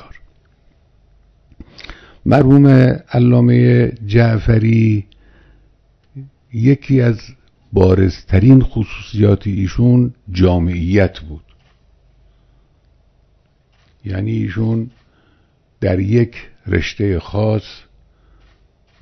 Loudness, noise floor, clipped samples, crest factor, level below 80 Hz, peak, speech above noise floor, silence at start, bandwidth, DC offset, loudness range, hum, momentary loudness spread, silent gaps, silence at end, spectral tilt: -14 LUFS; -55 dBFS; 0.2%; 16 dB; -34 dBFS; 0 dBFS; 43 dB; 1.9 s; 6.4 kHz; under 0.1%; 12 LU; none; 17 LU; none; 1.25 s; -9 dB/octave